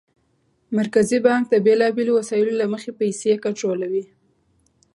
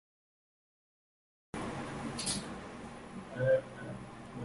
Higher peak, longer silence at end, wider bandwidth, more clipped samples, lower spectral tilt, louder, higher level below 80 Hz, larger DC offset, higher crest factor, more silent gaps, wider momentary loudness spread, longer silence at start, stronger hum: first, -4 dBFS vs -18 dBFS; first, 0.9 s vs 0 s; about the same, 11.5 kHz vs 11.5 kHz; neither; about the same, -5.5 dB/octave vs -4.5 dB/octave; first, -20 LUFS vs -38 LUFS; about the same, -66 dBFS vs -62 dBFS; neither; about the same, 18 dB vs 20 dB; neither; second, 8 LU vs 16 LU; second, 0.7 s vs 1.55 s; neither